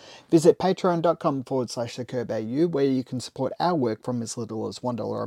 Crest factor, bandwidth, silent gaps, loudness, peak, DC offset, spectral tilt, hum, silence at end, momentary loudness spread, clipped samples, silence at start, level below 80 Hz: 20 dB; 14 kHz; none; -25 LUFS; -4 dBFS; under 0.1%; -6.5 dB/octave; none; 0 s; 11 LU; under 0.1%; 0.05 s; -66 dBFS